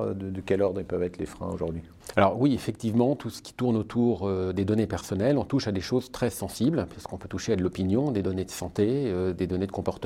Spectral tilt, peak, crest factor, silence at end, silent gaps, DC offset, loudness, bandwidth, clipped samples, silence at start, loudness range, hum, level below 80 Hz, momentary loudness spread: -6.5 dB/octave; -4 dBFS; 22 dB; 0 s; none; under 0.1%; -28 LUFS; 16 kHz; under 0.1%; 0 s; 2 LU; none; -52 dBFS; 8 LU